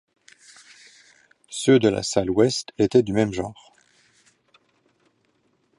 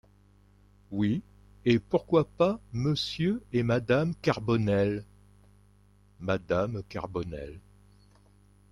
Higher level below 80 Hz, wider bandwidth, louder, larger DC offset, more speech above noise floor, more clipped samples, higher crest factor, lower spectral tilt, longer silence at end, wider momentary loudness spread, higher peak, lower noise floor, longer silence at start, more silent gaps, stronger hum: about the same, -54 dBFS vs -54 dBFS; about the same, 11.5 kHz vs 11 kHz; first, -21 LUFS vs -29 LUFS; neither; first, 47 dB vs 32 dB; neither; about the same, 20 dB vs 20 dB; second, -5 dB/octave vs -7 dB/octave; first, 2.25 s vs 1.15 s; about the same, 12 LU vs 11 LU; first, -4 dBFS vs -10 dBFS; first, -67 dBFS vs -60 dBFS; first, 1.5 s vs 0.9 s; neither; second, none vs 50 Hz at -50 dBFS